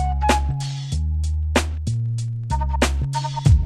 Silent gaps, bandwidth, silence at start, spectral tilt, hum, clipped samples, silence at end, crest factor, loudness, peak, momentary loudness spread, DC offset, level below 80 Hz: none; 13.5 kHz; 0 s; -5.5 dB/octave; none; under 0.1%; 0 s; 18 dB; -23 LUFS; -4 dBFS; 6 LU; under 0.1%; -24 dBFS